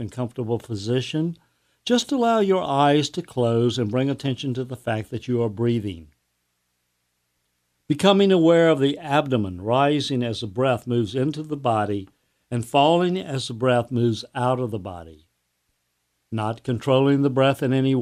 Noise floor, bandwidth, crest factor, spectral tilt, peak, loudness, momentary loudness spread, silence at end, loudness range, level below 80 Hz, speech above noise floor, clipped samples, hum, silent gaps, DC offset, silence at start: -73 dBFS; 14.5 kHz; 20 dB; -6.5 dB/octave; -2 dBFS; -22 LUFS; 11 LU; 0 s; 7 LU; -60 dBFS; 52 dB; under 0.1%; 60 Hz at -50 dBFS; none; under 0.1%; 0 s